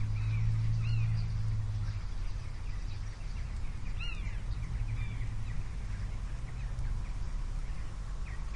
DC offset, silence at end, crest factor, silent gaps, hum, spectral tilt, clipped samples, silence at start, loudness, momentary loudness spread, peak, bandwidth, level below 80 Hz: under 0.1%; 0 s; 14 dB; none; none; -6.5 dB/octave; under 0.1%; 0 s; -38 LUFS; 10 LU; -20 dBFS; 10.5 kHz; -36 dBFS